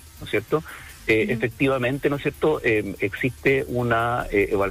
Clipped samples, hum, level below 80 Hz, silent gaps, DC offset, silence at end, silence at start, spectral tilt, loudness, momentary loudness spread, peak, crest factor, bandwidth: under 0.1%; none; -44 dBFS; none; under 0.1%; 0 s; 0.05 s; -6.5 dB/octave; -23 LUFS; 6 LU; -8 dBFS; 14 dB; 15.5 kHz